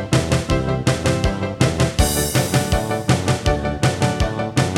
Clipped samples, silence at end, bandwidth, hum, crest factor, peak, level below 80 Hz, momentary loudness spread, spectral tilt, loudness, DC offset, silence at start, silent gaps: under 0.1%; 0 s; 17 kHz; none; 16 dB; -2 dBFS; -28 dBFS; 3 LU; -5 dB/octave; -19 LUFS; under 0.1%; 0 s; none